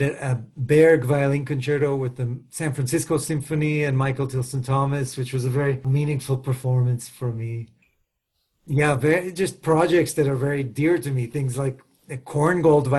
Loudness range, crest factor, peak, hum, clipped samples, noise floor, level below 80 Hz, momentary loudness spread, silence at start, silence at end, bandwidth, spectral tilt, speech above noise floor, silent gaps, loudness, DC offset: 4 LU; 16 dB; -6 dBFS; none; under 0.1%; -75 dBFS; -54 dBFS; 11 LU; 0 s; 0 s; 12.5 kHz; -6.5 dB/octave; 53 dB; none; -22 LUFS; under 0.1%